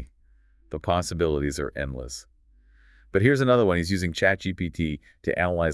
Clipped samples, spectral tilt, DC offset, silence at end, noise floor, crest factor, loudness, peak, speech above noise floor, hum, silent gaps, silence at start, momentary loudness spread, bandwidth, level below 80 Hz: under 0.1%; -6 dB/octave; under 0.1%; 0 s; -58 dBFS; 20 dB; -25 LUFS; -6 dBFS; 34 dB; none; none; 0 s; 13 LU; 12 kHz; -44 dBFS